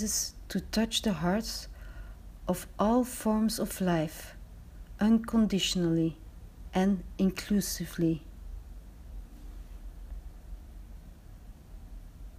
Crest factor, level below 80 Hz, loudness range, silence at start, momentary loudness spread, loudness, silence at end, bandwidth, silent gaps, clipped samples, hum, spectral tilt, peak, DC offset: 18 dB; -46 dBFS; 20 LU; 0 s; 23 LU; -30 LUFS; 0 s; 15.5 kHz; none; under 0.1%; none; -5 dB/octave; -14 dBFS; under 0.1%